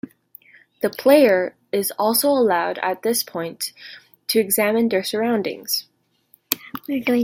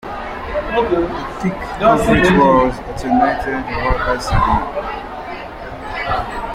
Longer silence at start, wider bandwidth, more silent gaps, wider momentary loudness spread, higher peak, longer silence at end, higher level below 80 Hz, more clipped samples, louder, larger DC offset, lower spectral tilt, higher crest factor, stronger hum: first, 0.8 s vs 0.05 s; about the same, 16.5 kHz vs 15.5 kHz; neither; second, 12 LU vs 15 LU; about the same, 0 dBFS vs -2 dBFS; about the same, 0 s vs 0 s; second, -68 dBFS vs -28 dBFS; neither; second, -20 LUFS vs -17 LUFS; neither; second, -3 dB/octave vs -6.5 dB/octave; about the same, 20 dB vs 16 dB; neither